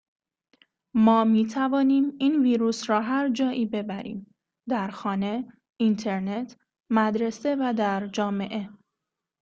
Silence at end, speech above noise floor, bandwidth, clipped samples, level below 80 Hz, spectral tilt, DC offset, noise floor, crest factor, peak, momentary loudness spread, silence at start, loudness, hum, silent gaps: 0.7 s; 61 dB; 7.6 kHz; under 0.1%; -68 dBFS; -6 dB/octave; under 0.1%; -85 dBFS; 18 dB; -6 dBFS; 12 LU; 0.95 s; -25 LUFS; none; 5.72-5.76 s